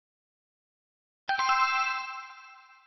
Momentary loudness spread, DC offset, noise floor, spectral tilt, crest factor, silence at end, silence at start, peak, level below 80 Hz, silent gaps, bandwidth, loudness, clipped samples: 20 LU; under 0.1%; -52 dBFS; 5 dB/octave; 20 dB; 0.25 s; 1.3 s; -14 dBFS; -74 dBFS; none; 6.2 kHz; -27 LUFS; under 0.1%